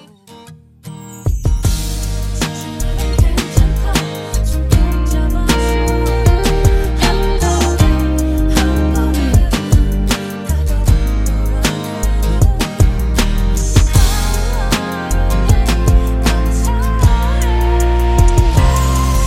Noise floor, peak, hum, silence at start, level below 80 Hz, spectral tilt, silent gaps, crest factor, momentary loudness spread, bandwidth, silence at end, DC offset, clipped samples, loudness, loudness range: -39 dBFS; 0 dBFS; none; 0.3 s; -14 dBFS; -5.5 dB/octave; none; 12 dB; 7 LU; 16 kHz; 0 s; under 0.1%; under 0.1%; -15 LUFS; 3 LU